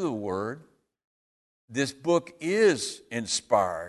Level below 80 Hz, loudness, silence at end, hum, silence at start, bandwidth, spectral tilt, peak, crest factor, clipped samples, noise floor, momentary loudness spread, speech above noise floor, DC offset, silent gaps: -64 dBFS; -27 LUFS; 0 s; none; 0 s; 12.5 kHz; -4 dB/octave; -10 dBFS; 18 dB; under 0.1%; under -90 dBFS; 12 LU; over 63 dB; under 0.1%; 1.04-1.68 s